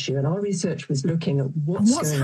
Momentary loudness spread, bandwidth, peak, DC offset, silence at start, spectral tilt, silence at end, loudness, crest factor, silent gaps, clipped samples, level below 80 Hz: 5 LU; 13 kHz; -10 dBFS; under 0.1%; 0 s; -6 dB/octave; 0 s; -23 LUFS; 14 dB; none; under 0.1%; -64 dBFS